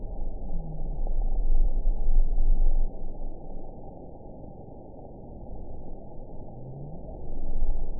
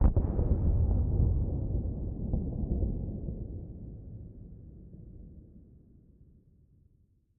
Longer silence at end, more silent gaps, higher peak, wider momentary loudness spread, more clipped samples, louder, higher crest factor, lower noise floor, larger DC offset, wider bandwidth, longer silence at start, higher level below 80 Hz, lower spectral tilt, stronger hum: second, 0 s vs 1.8 s; neither; about the same, -10 dBFS vs -12 dBFS; second, 15 LU vs 22 LU; neither; second, -36 LUFS vs -32 LUFS; second, 14 dB vs 20 dB; second, -43 dBFS vs -67 dBFS; first, 0.4% vs under 0.1%; second, 1 kHz vs 2 kHz; about the same, 0 s vs 0 s; first, -26 dBFS vs -34 dBFS; first, -16 dB/octave vs -14.5 dB/octave; neither